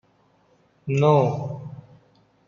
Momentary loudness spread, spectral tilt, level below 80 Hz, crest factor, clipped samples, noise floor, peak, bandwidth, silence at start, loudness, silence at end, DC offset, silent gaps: 22 LU; -8.5 dB/octave; -64 dBFS; 20 dB; under 0.1%; -62 dBFS; -4 dBFS; 7.2 kHz; 0.85 s; -21 LUFS; 0.65 s; under 0.1%; none